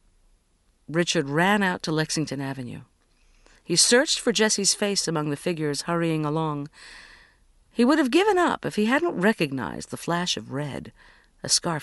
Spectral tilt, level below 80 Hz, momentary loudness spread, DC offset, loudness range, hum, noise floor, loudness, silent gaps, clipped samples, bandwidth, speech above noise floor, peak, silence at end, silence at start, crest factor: -3.5 dB/octave; -58 dBFS; 15 LU; under 0.1%; 4 LU; none; -65 dBFS; -23 LUFS; none; under 0.1%; 11.5 kHz; 41 dB; -4 dBFS; 0 s; 0.9 s; 20 dB